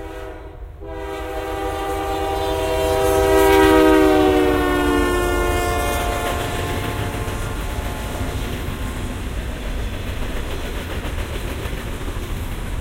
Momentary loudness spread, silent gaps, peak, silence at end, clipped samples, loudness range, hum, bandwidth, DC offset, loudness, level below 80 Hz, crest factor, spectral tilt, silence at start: 15 LU; none; 0 dBFS; 0 s; under 0.1%; 12 LU; none; 16 kHz; under 0.1%; -20 LUFS; -28 dBFS; 20 dB; -5.5 dB/octave; 0 s